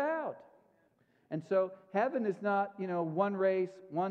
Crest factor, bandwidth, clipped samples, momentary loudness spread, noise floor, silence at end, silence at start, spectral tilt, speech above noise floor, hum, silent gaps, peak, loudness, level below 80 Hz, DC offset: 18 dB; 7.6 kHz; under 0.1%; 11 LU; -71 dBFS; 0 s; 0 s; -8.5 dB/octave; 38 dB; none; none; -16 dBFS; -34 LUFS; -90 dBFS; under 0.1%